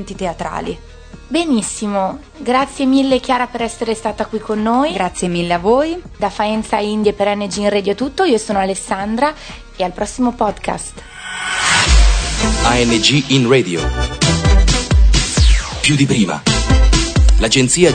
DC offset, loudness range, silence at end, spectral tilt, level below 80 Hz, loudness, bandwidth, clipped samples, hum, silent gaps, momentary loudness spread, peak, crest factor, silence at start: under 0.1%; 5 LU; 0 s; -4.5 dB/octave; -20 dBFS; -15 LUFS; 9.4 kHz; under 0.1%; none; none; 10 LU; 0 dBFS; 14 dB; 0 s